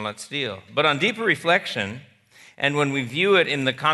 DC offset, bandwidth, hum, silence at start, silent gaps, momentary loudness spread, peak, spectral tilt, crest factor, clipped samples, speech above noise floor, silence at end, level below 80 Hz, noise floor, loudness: under 0.1%; 12 kHz; none; 0 s; none; 10 LU; -4 dBFS; -4.5 dB/octave; 20 dB; under 0.1%; 30 dB; 0 s; -70 dBFS; -52 dBFS; -22 LUFS